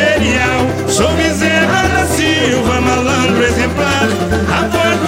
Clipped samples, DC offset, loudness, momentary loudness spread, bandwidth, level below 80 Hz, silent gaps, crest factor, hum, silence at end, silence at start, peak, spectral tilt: under 0.1%; under 0.1%; -12 LUFS; 3 LU; 16.5 kHz; -28 dBFS; none; 12 dB; none; 0 s; 0 s; 0 dBFS; -4.5 dB/octave